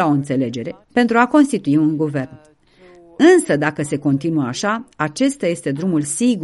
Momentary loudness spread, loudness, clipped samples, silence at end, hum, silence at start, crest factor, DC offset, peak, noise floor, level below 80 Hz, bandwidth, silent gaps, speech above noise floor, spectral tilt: 9 LU; -17 LUFS; under 0.1%; 0 s; none; 0 s; 18 dB; under 0.1%; 0 dBFS; -47 dBFS; -58 dBFS; 11.5 kHz; none; 30 dB; -5.5 dB/octave